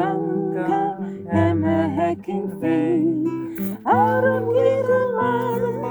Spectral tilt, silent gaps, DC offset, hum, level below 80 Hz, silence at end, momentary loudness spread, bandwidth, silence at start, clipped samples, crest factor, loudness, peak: -8.5 dB/octave; none; under 0.1%; none; -60 dBFS; 0 s; 8 LU; over 20 kHz; 0 s; under 0.1%; 14 dB; -21 LUFS; -6 dBFS